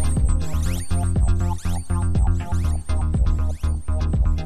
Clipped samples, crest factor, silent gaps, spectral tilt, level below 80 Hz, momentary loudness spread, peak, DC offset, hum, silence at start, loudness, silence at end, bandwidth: under 0.1%; 12 dB; none; -6.5 dB/octave; -22 dBFS; 4 LU; -8 dBFS; 1%; none; 0 s; -23 LUFS; 0 s; 13.5 kHz